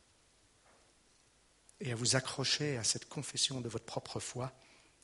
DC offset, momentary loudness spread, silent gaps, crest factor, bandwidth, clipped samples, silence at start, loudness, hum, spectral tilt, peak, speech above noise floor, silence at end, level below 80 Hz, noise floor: under 0.1%; 11 LU; none; 24 dB; 11.5 kHz; under 0.1%; 1.8 s; -36 LUFS; none; -2.5 dB/octave; -16 dBFS; 32 dB; 0.5 s; -70 dBFS; -69 dBFS